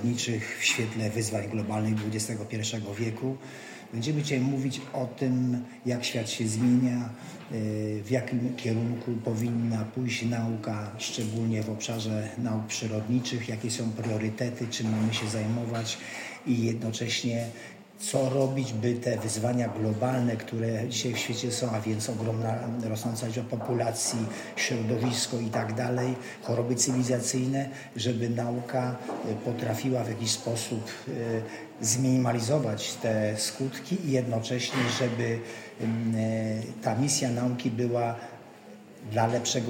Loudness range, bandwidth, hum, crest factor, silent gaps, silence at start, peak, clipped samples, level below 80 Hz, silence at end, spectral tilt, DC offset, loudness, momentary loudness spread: 2 LU; 16.5 kHz; none; 18 dB; none; 0 s; -10 dBFS; under 0.1%; -70 dBFS; 0 s; -5 dB/octave; under 0.1%; -29 LUFS; 8 LU